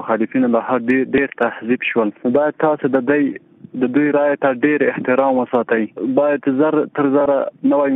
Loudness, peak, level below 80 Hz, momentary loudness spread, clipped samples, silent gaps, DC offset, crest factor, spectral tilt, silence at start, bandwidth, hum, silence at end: -17 LUFS; -2 dBFS; -60 dBFS; 4 LU; under 0.1%; none; under 0.1%; 14 dB; -9.5 dB/octave; 0 s; 3.9 kHz; none; 0 s